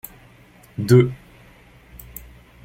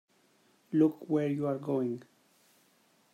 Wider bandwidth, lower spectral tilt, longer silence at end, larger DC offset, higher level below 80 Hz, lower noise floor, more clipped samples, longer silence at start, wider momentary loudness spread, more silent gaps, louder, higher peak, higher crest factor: first, 16.5 kHz vs 9.8 kHz; second, -7.5 dB/octave vs -9 dB/octave; first, 1.5 s vs 1.1 s; neither; first, -50 dBFS vs -80 dBFS; second, -50 dBFS vs -68 dBFS; neither; about the same, 0.8 s vs 0.7 s; first, 24 LU vs 7 LU; neither; first, -18 LUFS vs -31 LUFS; first, -2 dBFS vs -14 dBFS; about the same, 22 dB vs 20 dB